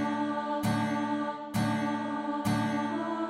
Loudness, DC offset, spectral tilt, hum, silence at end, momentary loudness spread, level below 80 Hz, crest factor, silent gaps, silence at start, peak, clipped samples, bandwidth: -31 LUFS; under 0.1%; -6 dB/octave; none; 0 s; 3 LU; -64 dBFS; 14 dB; none; 0 s; -16 dBFS; under 0.1%; 16 kHz